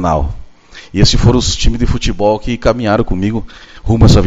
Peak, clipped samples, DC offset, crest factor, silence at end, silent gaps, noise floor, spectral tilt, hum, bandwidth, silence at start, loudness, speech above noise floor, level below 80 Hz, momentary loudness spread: 0 dBFS; 0.3%; under 0.1%; 12 dB; 0 s; none; -34 dBFS; -5.5 dB/octave; none; 8 kHz; 0 s; -13 LUFS; 23 dB; -18 dBFS; 13 LU